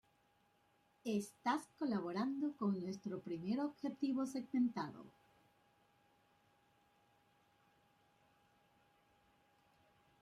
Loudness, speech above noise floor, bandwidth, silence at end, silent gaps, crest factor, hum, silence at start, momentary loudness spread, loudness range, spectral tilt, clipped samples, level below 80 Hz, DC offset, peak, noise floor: -41 LUFS; 35 dB; 13 kHz; 5.15 s; none; 18 dB; none; 1.05 s; 8 LU; 6 LU; -6.5 dB/octave; under 0.1%; -86 dBFS; under 0.1%; -26 dBFS; -76 dBFS